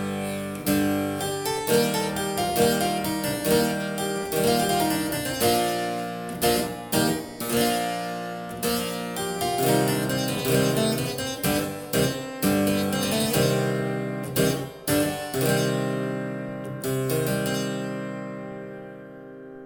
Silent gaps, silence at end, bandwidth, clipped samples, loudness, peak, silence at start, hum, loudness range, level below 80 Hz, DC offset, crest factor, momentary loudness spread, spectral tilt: none; 0 s; over 20 kHz; under 0.1%; -25 LUFS; -6 dBFS; 0 s; none; 3 LU; -52 dBFS; under 0.1%; 18 dB; 10 LU; -4.5 dB/octave